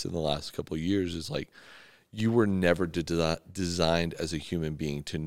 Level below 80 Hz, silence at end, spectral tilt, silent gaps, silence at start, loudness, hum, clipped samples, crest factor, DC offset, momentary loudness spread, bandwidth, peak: -54 dBFS; 0 s; -5.5 dB/octave; none; 0 s; -30 LUFS; none; under 0.1%; 22 dB; 0.3%; 10 LU; 16 kHz; -8 dBFS